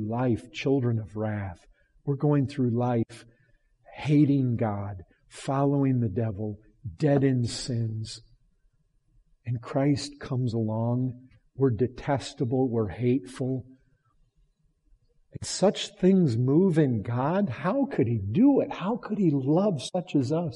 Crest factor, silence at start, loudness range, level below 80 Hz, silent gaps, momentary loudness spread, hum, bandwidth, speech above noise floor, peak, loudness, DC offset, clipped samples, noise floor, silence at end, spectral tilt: 16 dB; 0 s; 6 LU; -58 dBFS; none; 13 LU; none; 11.5 kHz; 42 dB; -10 dBFS; -27 LUFS; under 0.1%; under 0.1%; -67 dBFS; 0 s; -7 dB/octave